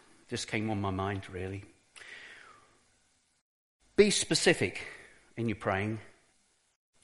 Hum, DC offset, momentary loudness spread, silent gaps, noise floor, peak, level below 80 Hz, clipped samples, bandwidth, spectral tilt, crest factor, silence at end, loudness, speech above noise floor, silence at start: none; under 0.1%; 23 LU; 3.41-3.80 s; -71 dBFS; -10 dBFS; -62 dBFS; under 0.1%; 11.5 kHz; -4 dB/octave; 24 dB; 0.95 s; -31 LUFS; 40 dB; 0.3 s